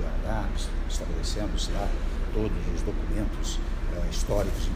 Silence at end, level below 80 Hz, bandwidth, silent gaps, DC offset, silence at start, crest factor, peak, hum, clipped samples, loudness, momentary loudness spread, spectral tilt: 0 s; -28 dBFS; 15 kHz; none; under 0.1%; 0 s; 16 dB; -12 dBFS; none; under 0.1%; -31 LUFS; 4 LU; -5 dB/octave